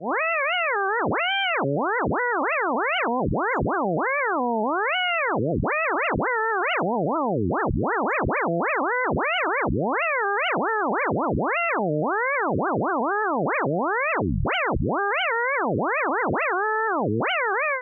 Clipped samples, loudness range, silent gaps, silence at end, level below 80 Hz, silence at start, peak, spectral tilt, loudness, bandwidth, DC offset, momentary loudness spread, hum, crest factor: under 0.1%; 0 LU; none; 0 s; -44 dBFS; 0 s; -14 dBFS; -9 dB/octave; -23 LUFS; 3.5 kHz; under 0.1%; 2 LU; none; 10 dB